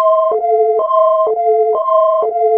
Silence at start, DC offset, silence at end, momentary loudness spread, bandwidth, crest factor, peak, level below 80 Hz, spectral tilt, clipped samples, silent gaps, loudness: 0 s; under 0.1%; 0 s; 2 LU; 3.4 kHz; 10 dB; -2 dBFS; -68 dBFS; -6.5 dB/octave; under 0.1%; none; -13 LUFS